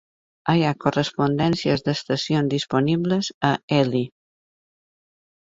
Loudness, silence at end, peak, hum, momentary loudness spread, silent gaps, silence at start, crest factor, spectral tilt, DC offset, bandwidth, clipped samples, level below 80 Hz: -22 LUFS; 1.4 s; -2 dBFS; none; 4 LU; 3.34-3.41 s, 3.63-3.68 s; 0.45 s; 22 dB; -6 dB/octave; under 0.1%; 7.8 kHz; under 0.1%; -56 dBFS